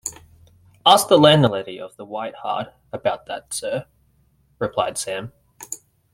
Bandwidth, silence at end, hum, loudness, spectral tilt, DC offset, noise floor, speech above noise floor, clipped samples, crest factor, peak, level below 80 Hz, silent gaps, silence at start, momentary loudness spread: 16.5 kHz; 0.4 s; none; -20 LUFS; -4 dB/octave; under 0.1%; -61 dBFS; 41 dB; under 0.1%; 20 dB; 0 dBFS; -58 dBFS; none; 0.05 s; 21 LU